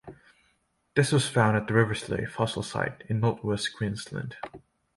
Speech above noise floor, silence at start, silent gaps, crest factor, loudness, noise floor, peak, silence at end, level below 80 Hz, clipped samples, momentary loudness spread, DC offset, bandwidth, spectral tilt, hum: 44 dB; 0.05 s; none; 22 dB; -27 LUFS; -71 dBFS; -6 dBFS; 0.4 s; -56 dBFS; under 0.1%; 13 LU; under 0.1%; 11.5 kHz; -5.5 dB/octave; none